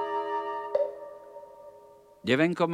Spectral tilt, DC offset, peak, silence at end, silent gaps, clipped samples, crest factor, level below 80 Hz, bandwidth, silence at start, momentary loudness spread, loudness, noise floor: -6.5 dB/octave; under 0.1%; -10 dBFS; 0 s; none; under 0.1%; 20 dB; -74 dBFS; 12.5 kHz; 0 s; 23 LU; -29 LUFS; -54 dBFS